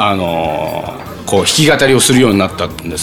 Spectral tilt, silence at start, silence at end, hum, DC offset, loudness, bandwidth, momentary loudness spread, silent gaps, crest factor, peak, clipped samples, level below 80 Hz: -4 dB/octave; 0 s; 0 s; none; under 0.1%; -12 LUFS; over 20 kHz; 13 LU; none; 12 dB; 0 dBFS; under 0.1%; -40 dBFS